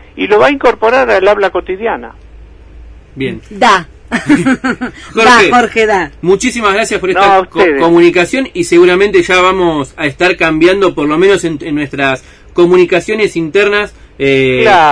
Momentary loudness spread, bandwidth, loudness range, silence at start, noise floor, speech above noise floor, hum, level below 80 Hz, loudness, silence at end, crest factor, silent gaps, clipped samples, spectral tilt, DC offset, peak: 10 LU; 11 kHz; 5 LU; 0.15 s; -34 dBFS; 25 dB; none; -36 dBFS; -9 LUFS; 0 s; 10 dB; none; 0.8%; -4.5 dB/octave; under 0.1%; 0 dBFS